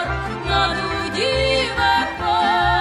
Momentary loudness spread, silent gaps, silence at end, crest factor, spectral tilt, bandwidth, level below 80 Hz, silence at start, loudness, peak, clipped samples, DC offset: 6 LU; none; 0 s; 14 dB; -4 dB/octave; 13.5 kHz; -34 dBFS; 0 s; -19 LUFS; -6 dBFS; under 0.1%; under 0.1%